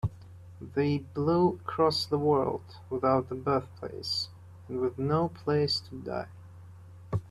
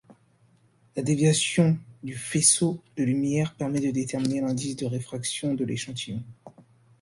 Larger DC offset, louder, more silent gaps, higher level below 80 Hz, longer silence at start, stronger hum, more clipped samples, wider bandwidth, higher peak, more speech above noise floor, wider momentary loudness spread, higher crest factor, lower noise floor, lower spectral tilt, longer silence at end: neither; second, -30 LUFS vs -25 LUFS; neither; about the same, -58 dBFS vs -62 dBFS; about the same, 0.05 s vs 0.1 s; neither; neither; first, 13 kHz vs 11.5 kHz; second, -12 dBFS vs -6 dBFS; second, 20 dB vs 36 dB; about the same, 13 LU vs 14 LU; about the same, 18 dB vs 22 dB; second, -49 dBFS vs -62 dBFS; first, -6.5 dB/octave vs -4.5 dB/octave; second, 0 s vs 0.4 s